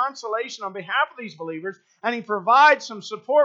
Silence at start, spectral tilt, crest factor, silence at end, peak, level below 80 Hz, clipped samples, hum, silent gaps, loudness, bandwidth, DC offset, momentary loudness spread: 0 s; -3 dB/octave; 18 dB; 0 s; -4 dBFS; -88 dBFS; under 0.1%; none; none; -21 LUFS; 7.8 kHz; under 0.1%; 18 LU